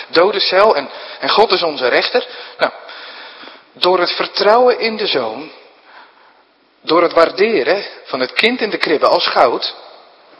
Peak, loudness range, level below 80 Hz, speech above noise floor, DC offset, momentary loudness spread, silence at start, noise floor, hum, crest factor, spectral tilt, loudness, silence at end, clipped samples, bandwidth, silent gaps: 0 dBFS; 3 LU; -60 dBFS; 38 dB; under 0.1%; 17 LU; 0 s; -53 dBFS; none; 16 dB; -4.5 dB/octave; -14 LUFS; 0.5 s; 0.1%; 11 kHz; none